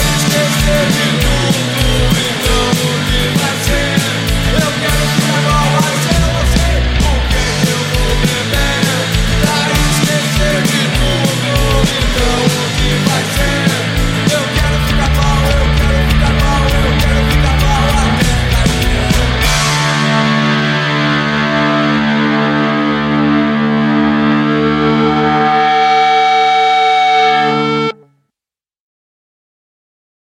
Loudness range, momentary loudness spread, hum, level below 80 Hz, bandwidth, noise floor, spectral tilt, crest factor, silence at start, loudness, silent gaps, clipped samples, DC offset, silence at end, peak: 2 LU; 4 LU; none; -18 dBFS; 16.5 kHz; -89 dBFS; -4.5 dB/octave; 12 dB; 0 s; -12 LUFS; none; under 0.1%; under 0.1%; 2.35 s; 0 dBFS